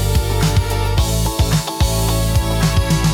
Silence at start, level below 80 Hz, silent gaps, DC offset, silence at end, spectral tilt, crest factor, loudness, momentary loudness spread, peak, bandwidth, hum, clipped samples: 0 s; -20 dBFS; none; under 0.1%; 0 s; -5 dB/octave; 12 dB; -17 LUFS; 2 LU; -4 dBFS; 18 kHz; none; under 0.1%